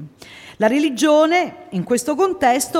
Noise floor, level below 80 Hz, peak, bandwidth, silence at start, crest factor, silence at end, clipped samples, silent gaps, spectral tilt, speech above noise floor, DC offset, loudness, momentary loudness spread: -41 dBFS; -58 dBFS; -4 dBFS; 16.5 kHz; 0 s; 14 dB; 0 s; under 0.1%; none; -4 dB/octave; 24 dB; under 0.1%; -17 LUFS; 10 LU